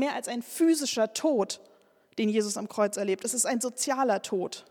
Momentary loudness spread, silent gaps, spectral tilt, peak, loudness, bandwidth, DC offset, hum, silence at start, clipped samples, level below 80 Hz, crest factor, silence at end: 8 LU; none; -3 dB/octave; -12 dBFS; -28 LUFS; 18 kHz; under 0.1%; none; 0 s; under 0.1%; -84 dBFS; 16 dB; 0.1 s